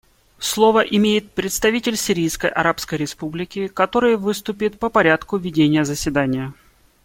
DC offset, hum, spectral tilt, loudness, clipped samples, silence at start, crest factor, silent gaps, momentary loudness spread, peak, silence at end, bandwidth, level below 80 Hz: under 0.1%; none; -4.5 dB/octave; -19 LUFS; under 0.1%; 0.4 s; 18 dB; none; 10 LU; -2 dBFS; 0.5 s; 17 kHz; -46 dBFS